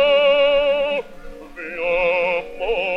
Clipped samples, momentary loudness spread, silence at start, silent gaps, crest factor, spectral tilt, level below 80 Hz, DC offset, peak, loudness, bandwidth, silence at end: under 0.1%; 18 LU; 0 s; none; 12 dB; -4 dB/octave; -42 dBFS; under 0.1%; -8 dBFS; -18 LUFS; 6 kHz; 0 s